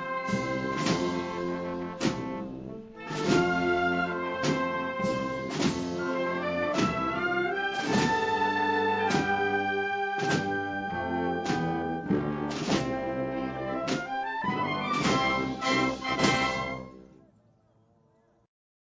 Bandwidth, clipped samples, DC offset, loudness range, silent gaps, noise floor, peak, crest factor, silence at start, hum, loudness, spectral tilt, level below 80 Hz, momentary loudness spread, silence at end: 8 kHz; under 0.1%; under 0.1%; 3 LU; none; -66 dBFS; -10 dBFS; 18 dB; 0 s; none; -29 LUFS; -5 dB/octave; -54 dBFS; 7 LU; 1.85 s